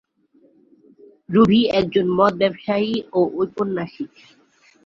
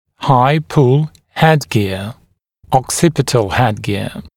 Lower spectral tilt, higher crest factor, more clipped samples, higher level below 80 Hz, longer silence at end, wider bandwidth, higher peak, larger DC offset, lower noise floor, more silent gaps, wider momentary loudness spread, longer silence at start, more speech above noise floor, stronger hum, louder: first, -7.5 dB/octave vs -5.5 dB/octave; about the same, 18 dB vs 14 dB; neither; second, -54 dBFS vs -42 dBFS; first, 0.8 s vs 0.1 s; second, 7.2 kHz vs 16.5 kHz; about the same, -2 dBFS vs 0 dBFS; neither; first, -58 dBFS vs -49 dBFS; neither; first, 12 LU vs 9 LU; first, 1.3 s vs 0.2 s; about the same, 39 dB vs 36 dB; neither; second, -19 LUFS vs -15 LUFS